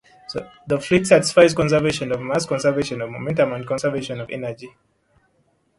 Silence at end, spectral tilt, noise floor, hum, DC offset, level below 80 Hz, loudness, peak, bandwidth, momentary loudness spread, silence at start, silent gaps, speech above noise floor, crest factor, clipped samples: 1.1 s; -5 dB/octave; -64 dBFS; none; under 0.1%; -52 dBFS; -20 LUFS; 0 dBFS; 11.5 kHz; 17 LU; 0.3 s; none; 44 dB; 20 dB; under 0.1%